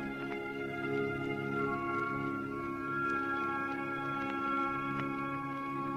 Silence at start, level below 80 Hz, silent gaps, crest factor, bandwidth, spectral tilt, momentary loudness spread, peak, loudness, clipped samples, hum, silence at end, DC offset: 0 s; -62 dBFS; none; 16 dB; 15.5 kHz; -7 dB/octave; 5 LU; -20 dBFS; -35 LUFS; under 0.1%; none; 0 s; under 0.1%